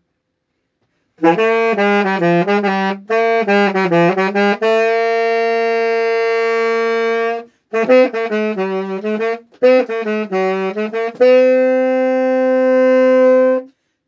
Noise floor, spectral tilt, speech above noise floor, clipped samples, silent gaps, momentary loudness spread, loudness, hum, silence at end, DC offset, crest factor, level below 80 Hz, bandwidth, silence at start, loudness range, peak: -71 dBFS; -6.5 dB/octave; 58 dB; under 0.1%; none; 9 LU; -15 LUFS; none; 0.4 s; under 0.1%; 14 dB; -78 dBFS; 7.4 kHz; 1.2 s; 3 LU; 0 dBFS